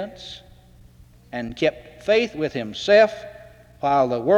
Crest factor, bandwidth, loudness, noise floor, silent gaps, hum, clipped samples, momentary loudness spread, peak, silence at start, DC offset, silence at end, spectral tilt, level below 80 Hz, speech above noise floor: 18 dB; 9.2 kHz; -21 LUFS; -50 dBFS; none; 60 Hz at -55 dBFS; under 0.1%; 21 LU; -6 dBFS; 0 s; under 0.1%; 0 s; -5 dB/octave; -52 dBFS; 29 dB